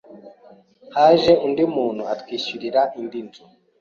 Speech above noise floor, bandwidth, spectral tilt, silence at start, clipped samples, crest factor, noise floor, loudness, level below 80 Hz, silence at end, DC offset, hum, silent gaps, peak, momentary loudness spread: 31 dB; 7.2 kHz; -6 dB/octave; 0.1 s; under 0.1%; 18 dB; -50 dBFS; -19 LUFS; -58 dBFS; 0.55 s; under 0.1%; none; none; -2 dBFS; 16 LU